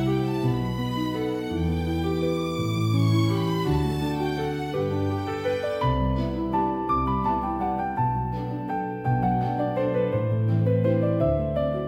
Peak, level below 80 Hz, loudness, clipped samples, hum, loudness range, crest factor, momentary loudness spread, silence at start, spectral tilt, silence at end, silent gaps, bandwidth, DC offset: -10 dBFS; -40 dBFS; -25 LUFS; under 0.1%; none; 1 LU; 14 dB; 5 LU; 0 s; -8 dB/octave; 0 s; none; 16 kHz; under 0.1%